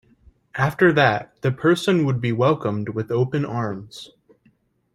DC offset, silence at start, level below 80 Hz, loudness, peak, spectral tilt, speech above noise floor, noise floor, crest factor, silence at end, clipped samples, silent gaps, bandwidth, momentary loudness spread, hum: under 0.1%; 0.55 s; -58 dBFS; -21 LUFS; -2 dBFS; -7 dB/octave; 41 dB; -62 dBFS; 20 dB; 0.9 s; under 0.1%; none; 13.5 kHz; 14 LU; none